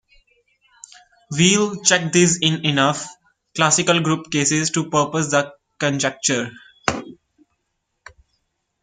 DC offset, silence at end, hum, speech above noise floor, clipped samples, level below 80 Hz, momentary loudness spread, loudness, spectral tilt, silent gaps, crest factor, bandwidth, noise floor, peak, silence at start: under 0.1%; 1.7 s; none; 56 dB; under 0.1%; -58 dBFS; 13 LU; -18 LUFS; -3 dB/octave; none; 22 dB; 9.8 kHz; -74 dBFS; 0 dBFS; 1.3 s